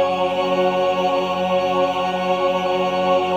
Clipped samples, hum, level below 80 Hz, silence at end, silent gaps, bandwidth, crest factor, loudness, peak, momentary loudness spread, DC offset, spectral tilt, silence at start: under 0.1%; none; -64 dBFS; 0 s; none; 12.5 kHz; 14 dB; -19 LUFS; -6 dBFS; 2 LU; 0.1%; -5.5 dB/octave; 0 s